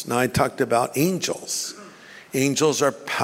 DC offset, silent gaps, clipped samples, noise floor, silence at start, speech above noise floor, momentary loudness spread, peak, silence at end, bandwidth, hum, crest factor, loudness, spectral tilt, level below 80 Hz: under 0.1%; none; under 0.1%; -45 dBFS; 0 s; 22 dB; 10 LU; -4 dBFS; 0 s; 16 kHz; none; 20 dB; -22 LUFS; -4 dB/octave; -52 dBFS